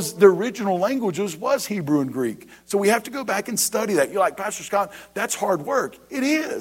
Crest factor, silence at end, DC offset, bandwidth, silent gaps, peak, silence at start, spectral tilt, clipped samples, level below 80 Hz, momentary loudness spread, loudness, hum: 20 dB; 0 s; under 0.1%; 16.5 kHz; none; -2 dBFS; 0 s; -4 dB/octave; under 0.1%; -64 dBFS; 7 LU; -22 LUFS; none